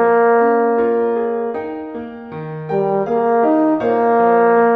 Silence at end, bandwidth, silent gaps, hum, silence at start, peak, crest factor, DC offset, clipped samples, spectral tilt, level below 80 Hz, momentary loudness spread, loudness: 0 s; 4.2 kHz; none; none; 0 s; -2 dBFS; 12 dB; under 0.1%; under 0.1%; -9.5 dB/octave; -58 dBFS; 15 LU; -15 LUFS